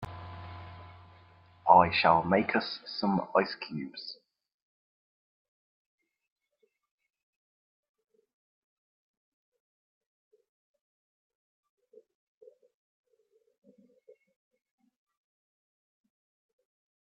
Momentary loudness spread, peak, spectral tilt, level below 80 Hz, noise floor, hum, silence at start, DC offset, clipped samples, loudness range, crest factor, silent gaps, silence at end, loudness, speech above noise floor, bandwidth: 24 LU; -6 dBFS; -3.5 dB/octave; -68 dBFS; -76 dBFS; none; 0 s; under 0.1%; under 0.1%; 19 LU; 30 dB; none; 12.9 s; -27 LUFS; 49 dB; 6 kHz